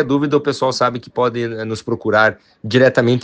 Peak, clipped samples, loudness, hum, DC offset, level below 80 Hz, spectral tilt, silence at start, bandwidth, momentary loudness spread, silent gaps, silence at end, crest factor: 0 dBFS; under 0.1%; -17 LUFS; none; under 0.1%; -58 dBFS; -6 dB/octave; 0 s; 9.4 kHz; 10 LU; none; 0 s; 16 dB